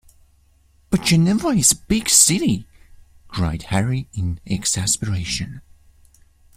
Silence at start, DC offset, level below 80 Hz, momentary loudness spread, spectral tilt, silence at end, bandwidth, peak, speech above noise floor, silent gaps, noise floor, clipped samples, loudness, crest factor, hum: 0.9 s; under 0.1%; -42 dBFS; 14 LU; -3.5 dB/octave; 0.95 s; 16.5 kHz; 0 dBFS; 37 dB; none; -56 dBFS; under 0.1%; -18 LUFS; 22 dB; none